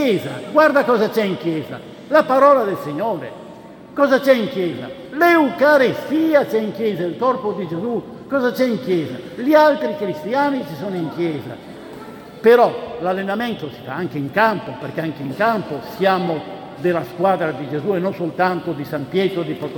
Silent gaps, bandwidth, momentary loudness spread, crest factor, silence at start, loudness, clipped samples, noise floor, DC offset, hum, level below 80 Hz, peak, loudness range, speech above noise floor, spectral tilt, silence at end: none; 18 kHz; 15 LU; 18 dB; 0 s; -18 LUFS; under 0.1%; -38 dBFS; under 0.1%; none; -62 dBFS; 0 dBFS; 4 LU; 20 dB; -6.5 dB/octave; 0 s